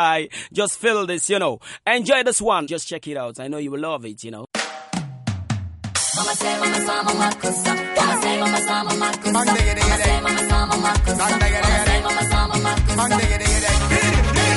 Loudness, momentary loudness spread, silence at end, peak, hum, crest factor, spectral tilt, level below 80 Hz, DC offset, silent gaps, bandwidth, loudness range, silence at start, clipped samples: -20 LUFS; 11 LU; 0 s; -4 dBFS; none; 16 dB; -3.5 dB/octave; -26 dBFS; under 0.1%; none; 11.5 kHz; 7 LU; 0 s; under 0.1%